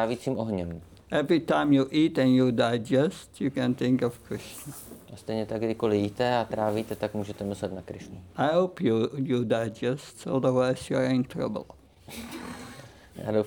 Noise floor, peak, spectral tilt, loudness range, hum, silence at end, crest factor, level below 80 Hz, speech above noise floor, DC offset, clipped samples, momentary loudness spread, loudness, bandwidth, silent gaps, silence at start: -47 dBFS; -10 dBFS; -6.5 dB/octave; 5 LU; none; 0 s; 16 dB; -60 dBFS; 20 dB; under 0.1%; under 0.1%; 18 LU; -27 LUFS; 20 kHz; none; 0 s